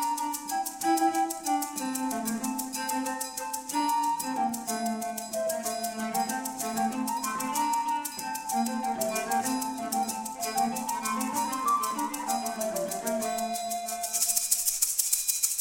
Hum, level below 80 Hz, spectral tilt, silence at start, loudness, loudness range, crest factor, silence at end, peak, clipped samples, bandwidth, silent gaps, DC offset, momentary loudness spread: none; -68 dBFS; -1.5 dB/octave; 0 s; -29 LUFS; 3 LU; 22 dB; 0 s; -8 dBFS; under 0.1%; 17 kHz; none; under 0.1%; 7 LU